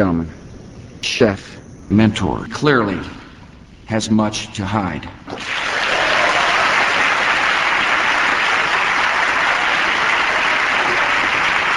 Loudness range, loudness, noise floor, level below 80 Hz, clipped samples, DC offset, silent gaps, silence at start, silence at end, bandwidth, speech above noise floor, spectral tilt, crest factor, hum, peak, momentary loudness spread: 6 LU; -16 LUFS; -40 dBFS; -44 dBFS; under 0.1%; under 0.1%; none; 0 s; 0 s; 12 kHz; 22 dB; -4 dB/octave; 18 dB; none; 0 dBFS; 10 LU